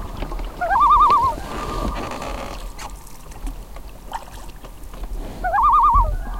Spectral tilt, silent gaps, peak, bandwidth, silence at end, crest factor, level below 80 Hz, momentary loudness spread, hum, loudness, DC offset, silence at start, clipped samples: -5 dB/octave; none; -4 dBFS; 16.5 kHz; 0 s; 16 dB; -30 dBFS; 26 LU; none; -18 LUFS; 0.3%; 0 s; under 0.1%